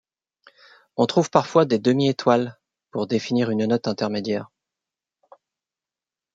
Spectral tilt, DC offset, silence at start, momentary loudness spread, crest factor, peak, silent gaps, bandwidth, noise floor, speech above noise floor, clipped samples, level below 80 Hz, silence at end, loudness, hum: -6 dB/octave; under 0.1%; 1 s; 11 LU; 22 dB; -2 dBFS; none; 7.8 kHz; under -90 dBFS; over 69 dB; under 0.1%; -68 dBFS; 1.9 s; -22 LUFS; none